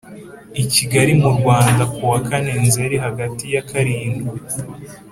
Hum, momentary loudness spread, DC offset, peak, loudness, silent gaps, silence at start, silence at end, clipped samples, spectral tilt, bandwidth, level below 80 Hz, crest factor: none; 14 LU; under 0.1%; 0 dBFS; -17 LUFS; none; 0.05 s; 0 s; under 0.1%; -5 dB/octave; 16 kHz; -46 dBFS; 18 dB